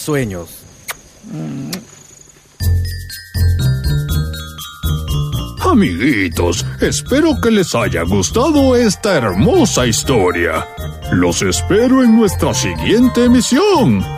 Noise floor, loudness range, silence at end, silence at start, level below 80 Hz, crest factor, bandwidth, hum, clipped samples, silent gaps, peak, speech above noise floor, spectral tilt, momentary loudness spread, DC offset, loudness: -43 dBFS; 7 LU; 0 s; 0 s; -28 dBFS; 14 dB; 16 kHz; none; under 0.1%; none; -2 dBFS; 30 dB; -5 dB/octave; 15 LU; under 0.1%; -14 LUFS